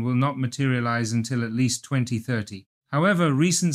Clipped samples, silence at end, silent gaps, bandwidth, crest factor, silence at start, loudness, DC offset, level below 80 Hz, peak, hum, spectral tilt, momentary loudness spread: under 0.1%; 0 s; 2.66-2.81 s; 14.5 kHz; 14 dB; 0 s; -24 LUFS; under 0.1%; -64 dBFS; -8 dBFS; none; -5 dB/octave; 9 LU